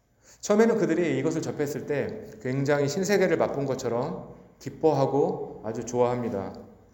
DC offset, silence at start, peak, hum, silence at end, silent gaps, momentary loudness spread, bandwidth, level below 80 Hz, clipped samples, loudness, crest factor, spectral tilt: under 0.1%; 0.45 s; -8 dBFS; none; 0.2 s; none; 15 LU; 17 kHz; -60 dBFS; under 0.1%; -26 LUFS; 18 dB; -6 dB/octave